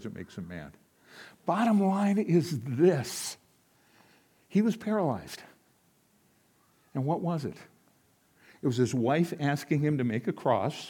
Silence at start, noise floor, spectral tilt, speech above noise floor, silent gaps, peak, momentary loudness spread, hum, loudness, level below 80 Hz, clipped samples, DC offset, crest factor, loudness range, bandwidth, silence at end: 0 s; -67 dBFS; -6.5 dB/octave; 39 dB; none; -12 dBFS; 17 LU; none; -29 LUFS; -72 dBFS; under 0.1%; under 0.1%; 18 dB; 8 LU; 18 kHz; 0 s